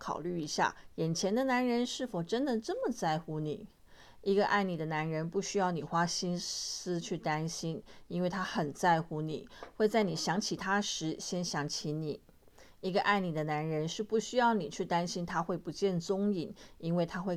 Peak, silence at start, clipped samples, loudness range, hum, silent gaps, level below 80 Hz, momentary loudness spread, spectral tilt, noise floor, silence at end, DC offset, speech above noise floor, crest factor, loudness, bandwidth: -14 dBFS; 0 s; under 0.1%; 2 LU; none; none; -64 dBFS; 9 LU; -4.5 dB/octave; -58 dBFS; 0 s; under 0.1%; 25 dB; 18 dB; -33 LUFS; 14.5 kHz